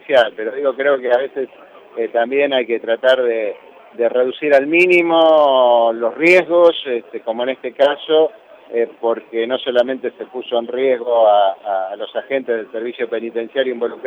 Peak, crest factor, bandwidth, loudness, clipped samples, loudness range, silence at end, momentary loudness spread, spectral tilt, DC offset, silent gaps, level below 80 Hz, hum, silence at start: -2 dBFS; 14 dB; 9.8 kHz; -16 LUFS; under 0.1%; 6 LU; 0 s; 13 LU; -5 dB/octave; under 0.1%; none; -70 dBFS; none; 0.1 s